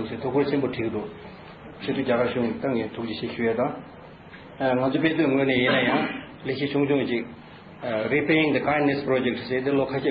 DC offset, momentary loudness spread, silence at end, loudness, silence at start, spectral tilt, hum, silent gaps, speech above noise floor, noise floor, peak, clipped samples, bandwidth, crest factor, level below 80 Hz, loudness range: under 0.1%; 21 LU; 0 s; -24 LUFS; 0 s; -4 dB/octave; none; none; 20 dB; -44 dBFS; -8 dBFS; under 0.1%; 5.2 kHz; 16 dB; -58 dBFS; 4 LU